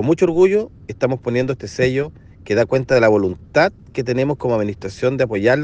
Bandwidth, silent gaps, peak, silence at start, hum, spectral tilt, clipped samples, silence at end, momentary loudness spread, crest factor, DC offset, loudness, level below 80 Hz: 8.8 kHz; none; 0 dBFS; 0 s; none; -7 dB/octave; under 0.1%; 0 s; 9 LU; 18 dB; under 0.1%; -18 LUFS; -48 dBFS